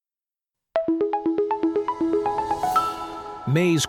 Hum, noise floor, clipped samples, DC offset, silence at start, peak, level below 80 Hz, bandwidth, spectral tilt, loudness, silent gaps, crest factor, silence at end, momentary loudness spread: none; under -90 dBFS; under 0.1%; under 0.1%; 0.75 s; -8 dBFS; -56 dBFS; 17.5 kHz; -5.5 dB/octave; -24 LUFS; none; 16 dB; 0 s; 7 LU